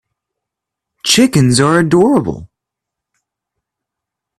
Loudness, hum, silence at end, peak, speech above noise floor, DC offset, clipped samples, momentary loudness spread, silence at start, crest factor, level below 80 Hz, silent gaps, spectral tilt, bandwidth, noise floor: -11 LUFS; none; 1.95 s; 0 dBFS; 70 dB; under 0.1%; under 0.1%; 12 LU; 1.05 s; 16 dB; -46 dBFS; none; -4.5 dB/octave; 15 kHz; -81 dBFS